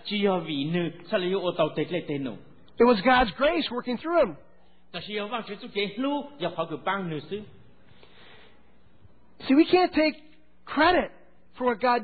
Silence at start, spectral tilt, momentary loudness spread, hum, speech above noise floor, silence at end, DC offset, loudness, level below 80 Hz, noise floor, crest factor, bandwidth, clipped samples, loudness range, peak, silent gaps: 0.05 s; -10 dB/octave; 14 LU; none; 35 dB; 0 s; 0.3%; -26 LUFS; -54 dBFS; -60 dBFS; 18 dB; 4.8 kHz; under 0.1%; 8 LU; -8 dBFS; none